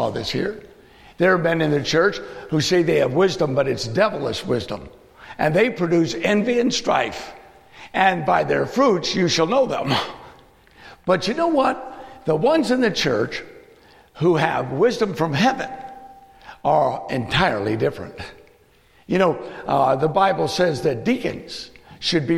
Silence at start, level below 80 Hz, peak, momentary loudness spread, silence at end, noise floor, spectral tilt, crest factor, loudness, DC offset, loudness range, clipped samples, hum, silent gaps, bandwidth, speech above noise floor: 0 s; -50 dBFS; -2 dBFS; 14 LU; 0 s; -55 dBFS; -5 dB/octave; 18 dB; -20 LUFS; under 0.1%; 2 LU; under 0.1%; none; none; 15 kHz; 35 dB